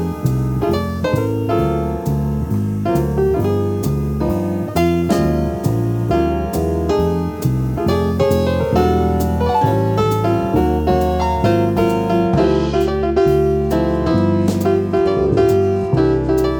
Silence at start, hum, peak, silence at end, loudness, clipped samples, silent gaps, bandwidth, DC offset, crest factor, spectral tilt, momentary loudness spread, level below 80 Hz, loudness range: 0 s; none; -2 dBFS; 0 s; -17 LUFS; under 0.1%; none; over 20 kHz; under 0.1%; 14 dB; -8 dB/octave; 4 LU; -28 dBFS; 3 LU